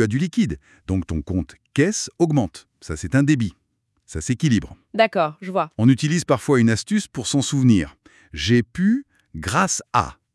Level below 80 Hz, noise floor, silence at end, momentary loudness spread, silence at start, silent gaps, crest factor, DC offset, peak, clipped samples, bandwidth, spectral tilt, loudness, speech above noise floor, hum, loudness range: -46 dBFS; -66 dBFS; 0.25 s; 13 LU; 0 s; none; 18 dB; under 0.1%; -2 dBFS; under 0.1%; 12 kHz; -5.5 dB/octave; -21 LUFS; 46 dB; none; 3 LU